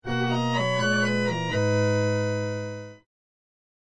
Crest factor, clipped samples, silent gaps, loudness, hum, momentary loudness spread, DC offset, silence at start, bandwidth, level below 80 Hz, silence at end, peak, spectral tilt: 12 dB; under 0.1%; none; -25 LUFS; none; 11 LU; 0.6%; 0 s; 10 kHz; -60 dBFS; 0.8 s; -14 dBFS; -5.5 dB/octave